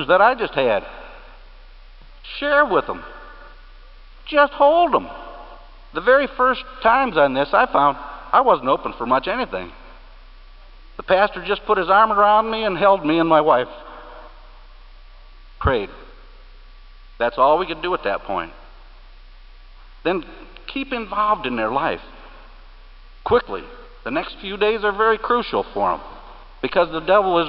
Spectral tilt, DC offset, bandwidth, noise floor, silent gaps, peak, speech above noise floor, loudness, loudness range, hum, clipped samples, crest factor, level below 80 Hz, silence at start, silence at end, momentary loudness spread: -9.5 dB/octave; under 0.1%; 5.6 kHz; -42 dBFS; none; -2 dBFS; 24 dB; -19 LUFS; 8 LU; none; under 0.1%; 20 dB; -42 dBFS; 0 s; 0 s; 19 LU